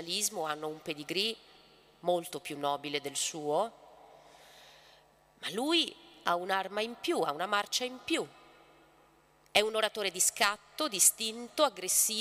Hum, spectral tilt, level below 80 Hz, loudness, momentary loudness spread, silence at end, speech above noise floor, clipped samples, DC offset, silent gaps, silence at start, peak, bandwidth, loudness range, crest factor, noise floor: none; -1 dB/octave; -74 dBFS; -31 LUFS; 12 LU; 0 s; 32 dB; under 0.1%; under 0.1%; none; 0 s; -10 dBFS; 16 kHz; 7 LU; 24 dB; -64 dBFS